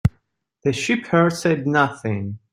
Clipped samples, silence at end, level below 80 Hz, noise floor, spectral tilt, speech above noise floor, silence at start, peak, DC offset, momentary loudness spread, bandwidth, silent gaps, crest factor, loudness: under 0.1%; 0.15 s; -44 dBFS; -67 dBFS; -6 dB/octave; 47 dB; 0.05 s; -2 dBFS; under 0.1%; 9 LU; 15.5 kHz; none; 18 dB; -21 LUFS